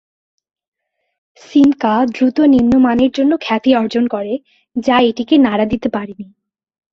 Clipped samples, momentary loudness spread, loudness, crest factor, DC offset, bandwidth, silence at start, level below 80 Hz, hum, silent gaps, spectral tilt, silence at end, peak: under 0.1%; 12 LU; -14 LUFS; 14 dB; under 0.1%; 7 kHz; 1.5 s; -46 dBFS; none; none; -6.5 dB/octave; 0.7 s; -2 dBFS